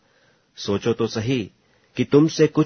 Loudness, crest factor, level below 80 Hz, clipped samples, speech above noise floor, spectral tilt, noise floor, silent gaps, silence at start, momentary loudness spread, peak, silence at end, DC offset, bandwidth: -21 LUFS; 20 dB; -58 dBFS; under 0.1%; 41 dB; -6.5 dB/octave; -60 dBFS; none; 0.6 s; 16 LU; -2 dBFS; 0 s; under 0.1%; 6.6 kHz